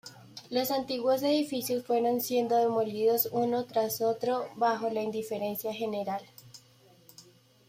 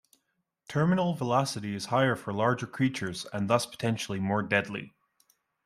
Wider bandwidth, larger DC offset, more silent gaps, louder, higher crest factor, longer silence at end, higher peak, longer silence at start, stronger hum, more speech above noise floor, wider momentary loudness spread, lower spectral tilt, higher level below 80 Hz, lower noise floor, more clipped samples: about the same, 16.5 kHz vs 15 kHz; neither; neither; about the same, -30 LUFS vs -29 LUFS; about the same, 16 dB vs 20 dB; second, 0.45 s vs 0.8 s; second, -16 dBFS vs -10 dBFS; second, 0.05 s vs 0.7 s; neither; second, 31 dB vs 51 dB; about the same, 7 LU vs 8 LU; about the same, -4.5 dB/octave vs -5.5 dB/octave; second, -74 dBFS vs -68 dBFS; second, -60 dBFS vs -79 dBFS; neither